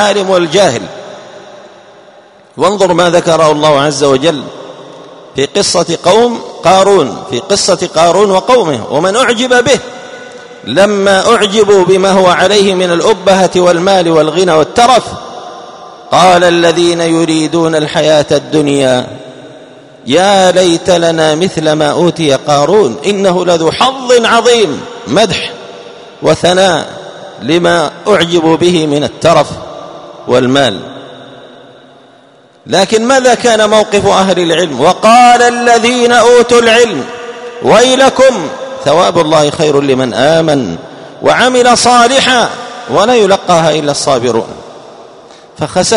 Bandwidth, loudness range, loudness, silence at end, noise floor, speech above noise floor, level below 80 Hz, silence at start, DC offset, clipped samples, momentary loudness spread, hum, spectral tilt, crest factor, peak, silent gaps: 12.5 kHz; 5 LU; -8 LUFS; 0 s; -42 dBFS; 34 dB; -44 dBFS; 0 s; under 0.1%; 1%; 17 LU; none; -4 dB/octave; 8 dB; 0 dBFS; none